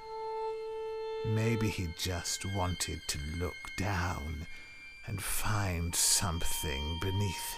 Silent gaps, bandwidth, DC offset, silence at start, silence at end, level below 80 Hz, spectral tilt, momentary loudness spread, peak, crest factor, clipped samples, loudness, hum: none; 16 kHz; 0.1%; 0 s; 0 s; -44 dBFS; -3.5 dB/octave; 11 LU; -14 dBFS; 20 dB; under 0.1%; -34 LUFS; none